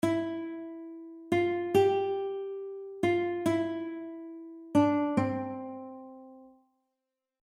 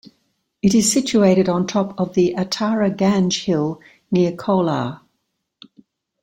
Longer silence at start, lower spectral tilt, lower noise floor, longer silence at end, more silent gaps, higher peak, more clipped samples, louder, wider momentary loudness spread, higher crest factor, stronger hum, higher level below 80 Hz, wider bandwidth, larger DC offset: second, 0.05 s vs 0.65 s; first, -7 dB/octave vs -5 dB/octave; first, -86 dBFS vs -74 dBFS; second, 1 s vs 1.25 s; neither; second, -12 dBFS vs -2 dBFS; neither; second, -30 LUFS vs -18 LUFS; first, 19 LU vs 7 LU; about the same, 18 dB vs 16 dB; neither; second, -70 dBFS vs -54 dBFS; second, 14.5 kHz vs 16.5 kHz; neither